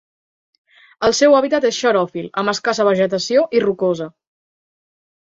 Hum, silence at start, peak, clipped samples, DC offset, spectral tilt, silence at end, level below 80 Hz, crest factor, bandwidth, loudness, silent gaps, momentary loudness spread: none; 1 s; -2 dBFS; under 0.1%; under 0.1%; -4 dB/octave; 1.1 s; -58 dBFS; 16 dB; 8 kHz; -17 LUFS; none; 8 LU